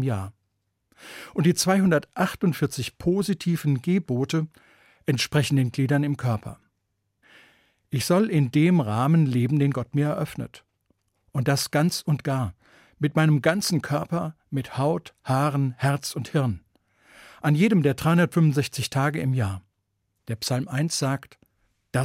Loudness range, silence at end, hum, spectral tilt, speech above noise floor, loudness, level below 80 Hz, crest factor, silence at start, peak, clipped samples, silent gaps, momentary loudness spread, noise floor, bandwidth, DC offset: 4 LU; 0 s; none; -6 dB/octave; 53 dB; -24 LUFS; -58 dBFS; 18 dB; 0 s; -6 dBFS; under 0.1%; none; 11 LU; -76 dBFS; 16 kHz; under 0.1%